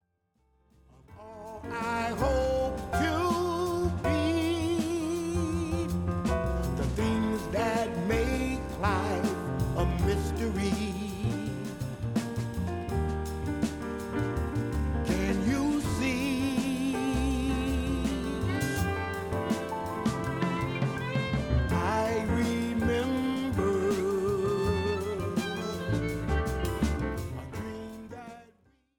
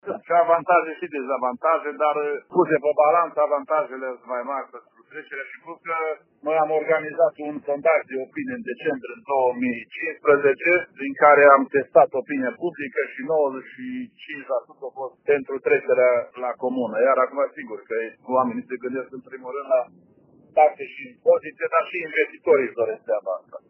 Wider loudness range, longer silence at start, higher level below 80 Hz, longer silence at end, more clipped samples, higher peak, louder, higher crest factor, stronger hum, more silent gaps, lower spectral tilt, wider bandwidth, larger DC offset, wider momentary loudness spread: second, 4 LU vs 8 LU; first, 1.1 s vs 0.05 s; first, -40 dBFS vs -78 dBFS; first, 0.55 s vs 0.1 s; neither; second, -14 dBFS vs -2 dBFS; second, -30 LUFS vs -22 LUFS; second, 14 dB vs 22 dB; neither; neither; first, -6 dB/octave vs -4 dB/octave; first, 19.5 kHz vs 3.2 kHz; neither; second, 6 LU vs 15 LU